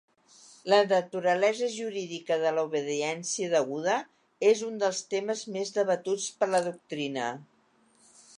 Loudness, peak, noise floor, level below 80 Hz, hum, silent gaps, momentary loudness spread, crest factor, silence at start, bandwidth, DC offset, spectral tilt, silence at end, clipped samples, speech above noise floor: -28 LUFS; -8 dBFS; -65 dBFS; -84 dBFS; none; none; 9 LU; 20 dB; 0.65 s; 11 kHz; under 0.1%; -3.5 dB/octave; 0.95 s; under 0.1%; 37 dB